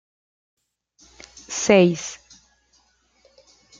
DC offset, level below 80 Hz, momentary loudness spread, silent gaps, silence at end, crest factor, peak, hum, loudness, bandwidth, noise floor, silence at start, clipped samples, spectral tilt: under 0.1%; -62 dBFS; 26 LU; none; 1.65 s; 24 dB; 0 dBFS; none; -19 LUFS; 9.4 kHz; -63 dBFS; 1.5 s; under 0.1%; -4.5 dB/octave